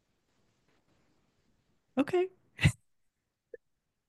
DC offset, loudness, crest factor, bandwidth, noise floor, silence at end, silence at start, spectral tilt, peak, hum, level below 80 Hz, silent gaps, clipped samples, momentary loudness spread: under 0.1%; -32 LUFS; 26 dB; 12 kHz; -82 dBFS; 1.35 s; 1.95 s; -6 dB/octave; -12 dBFS; none; -54 dBFS; none; under 0.1%; 8 LU